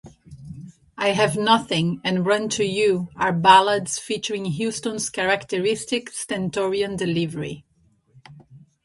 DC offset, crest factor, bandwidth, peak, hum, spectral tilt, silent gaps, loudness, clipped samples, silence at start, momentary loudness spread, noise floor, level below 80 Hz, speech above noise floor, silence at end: under 0.1%; 22 dB; 11.5 kHz; 0 dBFS; none; -4 dB/octave; none; -21 LUFS; under 0.1%; 0.05 s; 14 LU; -62 dBFS; -58 dBFS; 40 dB; 0.25 s